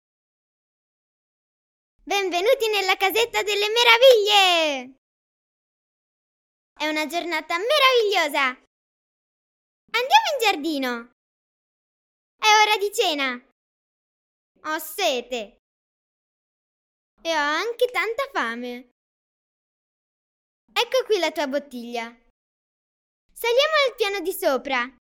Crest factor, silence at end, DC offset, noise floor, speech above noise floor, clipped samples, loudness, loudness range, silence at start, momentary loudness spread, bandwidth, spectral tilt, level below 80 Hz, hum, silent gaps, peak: 24 dB; 0.1 s; under 0.1%; under -90 dBFS; over 69 dB; under 0.1%; -20 LUFS; 10 LU; 2.05 s; 16 LU; 17.5 kHz; 0 dB/octave; -68 dBFS; none; 4.98-6.76 s, 8.67-9.88 s, 11.12-12.39 s, 13.52-14.55 s, 15.59-17.17 s, 18.91-20.68 s, 22.30-23.29 s; 0 dBFS